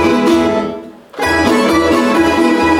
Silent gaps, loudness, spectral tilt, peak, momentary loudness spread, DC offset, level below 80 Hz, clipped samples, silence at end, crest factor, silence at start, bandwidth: none; -12 LUFS; -5 dB/octave; -2 dBFS; 11 LU; under 0.1%; -36 dBFS; under 0.1%; 0 s; 10 dB; 0 s; 15.5 kHz